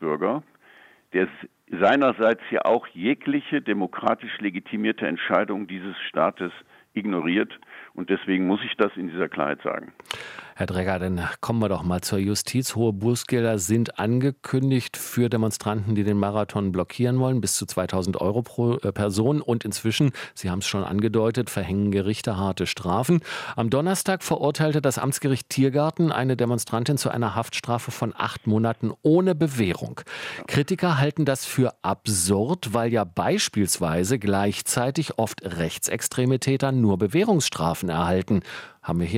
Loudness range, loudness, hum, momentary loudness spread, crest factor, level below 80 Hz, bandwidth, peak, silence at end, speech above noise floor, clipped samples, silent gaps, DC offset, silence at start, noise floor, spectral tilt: 3 LU; -24 LUFS; none; 7 LU; 20 dB; -58 dBFS; 16.5 kHz; -4 dBFS; 0 s; 30 dB; under 0.1%; none; under 0.1%; 0 s; -53 dBFS; -5 dB/octave